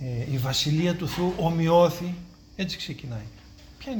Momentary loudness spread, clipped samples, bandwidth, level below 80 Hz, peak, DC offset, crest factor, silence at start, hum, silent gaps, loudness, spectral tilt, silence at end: 18 LU; under 0.1%; over 20 kHz; -48 dBFS; -8 dBFS; under 0.1%; 18 dB; 0 s; none; none; -25 LUFS; -5.5 dB/octave; 0 s